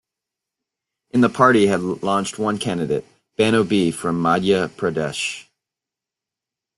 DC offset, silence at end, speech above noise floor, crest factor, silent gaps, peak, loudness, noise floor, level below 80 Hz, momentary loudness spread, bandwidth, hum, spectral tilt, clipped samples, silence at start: under 0.1%; 1.35 s; 68 dB; 20 dB; none; -2 dBFS; -19 LUFS; -87 dBFS; -56 dBFS; 10 LU; 12.5 kHz; none; -5.5 dB/octave; under 0.1%; 1.15 s